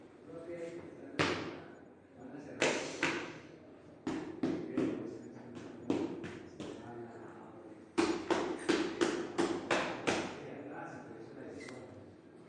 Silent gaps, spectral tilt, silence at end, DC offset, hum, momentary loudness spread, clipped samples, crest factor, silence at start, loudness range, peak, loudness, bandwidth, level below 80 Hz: none; -4 dB/octave; 0 s; under 0.1%; none; 18 LU; under 0.1%; 24 dB; 0 s; 5 LU; -16 dBFS; -38 LUFS; 11 kHz; -74 dBFS